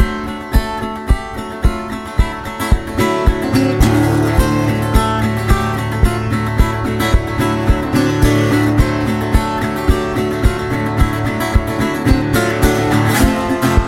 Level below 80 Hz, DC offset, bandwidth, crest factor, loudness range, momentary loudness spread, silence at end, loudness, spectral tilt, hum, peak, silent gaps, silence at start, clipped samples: -20 dBFS; 0.1%; 16.5 kHz; 14 dB; 2 LU; 6 LU; 0 s; -16 LUFS; -6 dB/octave; none; 0 dBFS; none; 0 s; under 0.1%